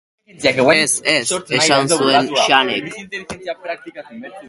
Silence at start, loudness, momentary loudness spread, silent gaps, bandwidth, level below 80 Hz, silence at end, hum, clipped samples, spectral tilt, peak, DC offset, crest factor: 0.4 s; -14 LUFS; 16 LU; none; 12 kHz; -56 dBFS; 0 s; none; under 0.1%; -2.5 dB/octave; 0 dBFS; under 0.1%; 18 dB